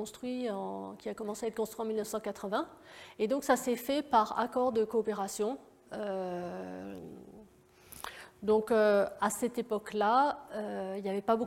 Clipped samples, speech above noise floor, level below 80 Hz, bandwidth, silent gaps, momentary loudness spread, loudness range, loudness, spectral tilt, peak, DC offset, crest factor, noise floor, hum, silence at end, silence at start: under 0.1%; 27 dB; -70 dBFS; 16.5 kHz; none; 17 LU; 7 LU; -33 LUFS; -4.5 dB/octave; -14 dBFS; under 0.1%; 20 dB; -60 dBFS; none; 0 s; 0 s